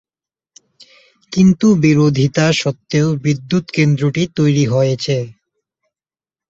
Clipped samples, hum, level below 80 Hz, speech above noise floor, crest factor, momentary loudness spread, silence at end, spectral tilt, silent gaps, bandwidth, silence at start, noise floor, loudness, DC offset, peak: under 0.1%; none; -50 dBFS; over 76 dB; 14 dB; 7 LU; 1.15 s; -6.5 dB/octave; none; 7.8 kHz; 1.3 s; under -90 dBFS; -15 LUFS; under 0.1%; -2 dBFS